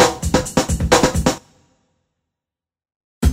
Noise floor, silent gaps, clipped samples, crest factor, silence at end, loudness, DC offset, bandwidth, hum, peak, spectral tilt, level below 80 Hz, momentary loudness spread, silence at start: -89 dBFS; 2.96-3.21 s; under 0.1%; 20 dB; 0 s; -17 LUFS; under 0.1%; 16 kHz; none; 0 dBFS; -4.5 dB/octave; -28 dBFS; 7 LU; 0 s